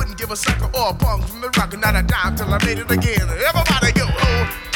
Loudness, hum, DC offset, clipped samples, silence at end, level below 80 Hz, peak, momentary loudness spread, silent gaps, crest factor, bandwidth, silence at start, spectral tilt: -18 LUFS; none; under 0.1%; under 0.1%; 0 s; -24 dBFS; -2 dBFS; 5 LU; none; 16 dB; 18.5 kHz; 0 s; -4.5 dB/octave